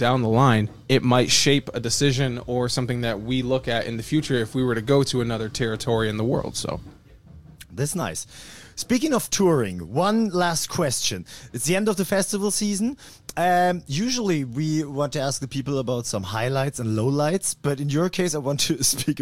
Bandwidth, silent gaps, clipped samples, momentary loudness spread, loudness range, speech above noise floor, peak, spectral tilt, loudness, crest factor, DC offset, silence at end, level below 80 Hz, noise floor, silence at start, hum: 16.5 kHz; none; under 0.1%; 8 LU; 4 LU; 24 dB; -4 dBFS; -4.5 dB/octave; -23 LUFS; 18 dB; under 0.1%; 0 s; -50 dBFS; -47 dBFS; 0 s; none